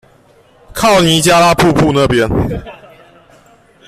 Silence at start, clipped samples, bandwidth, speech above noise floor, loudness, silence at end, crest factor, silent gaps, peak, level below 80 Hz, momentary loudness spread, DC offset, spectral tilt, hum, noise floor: 0.75 s; under 0.1%; 16 kHz; 37 dB; -10 LUFS; 1.15 s; 14 dB; none; 0 dBFS; -32 dBFS; 12 LU; under 0.1%; -4.5 dB/octave; none; -47 dBFS